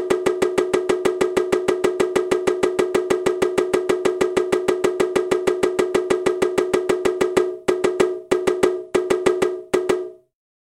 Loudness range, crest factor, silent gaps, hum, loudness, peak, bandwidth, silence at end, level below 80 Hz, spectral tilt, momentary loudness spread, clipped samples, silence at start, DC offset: 0 LU; 18 dB; none; none; -20 LUFS; -2 dBFS; 16 kHz; 0.55 s; -52 dBFS; -4.5 dB/octave; 2 LU; under 0.1%; 0 s; under 0.1%